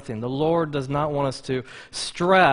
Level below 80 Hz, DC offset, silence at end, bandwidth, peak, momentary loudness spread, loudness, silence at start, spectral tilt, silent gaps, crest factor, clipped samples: -52 dBFS; under 0.1%; 0 s; 11 kHz; -4 dBFS; 10 LU; -24 LUFS; 0 s; -5 dB/octave; none; 18 dB; under 0.1%